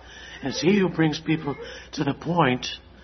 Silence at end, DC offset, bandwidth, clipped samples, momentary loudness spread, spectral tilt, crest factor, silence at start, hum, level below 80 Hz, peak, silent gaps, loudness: 0 s; under 0.1%; 6.4 kHz; under 0.1%; 13 LU; -5.5 dB/octave; 20 dB; 0 s; none; -52 dBFS; -6 dBFS; none; -24 LUFS